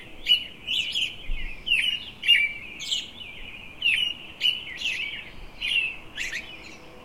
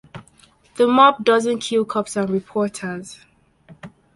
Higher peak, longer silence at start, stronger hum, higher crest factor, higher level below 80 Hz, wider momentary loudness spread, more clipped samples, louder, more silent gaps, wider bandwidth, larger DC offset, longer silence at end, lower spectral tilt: second, -8 dBFS vs -2 dBFS; second, 0 s vs 0.15 s; neither; about the same, 20 dB vs 18 dB; first, -42 dBFS vs -60 dBFS; about the same, 18 LU vs 18 LU; neither; second, -24 LUFS vs -18 LUFS; neither; first, 16.5 kHz vs 11.5 kHz; first, 0.3% vs under 0.1%; second, 0 s vs 0.3 s; second, 0 dB/octave vs -4.5 dB/octave